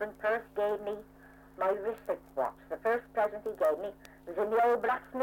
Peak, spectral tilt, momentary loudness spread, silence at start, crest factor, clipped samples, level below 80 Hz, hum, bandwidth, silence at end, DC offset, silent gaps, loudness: -18 dBFS; -5.5 dB/octave; 11 LU; 0 s; 14 dB; under 0.1%; -64 dBFS; none; 17 kHz; 0 s; under 0.1%; none; -33 LUFS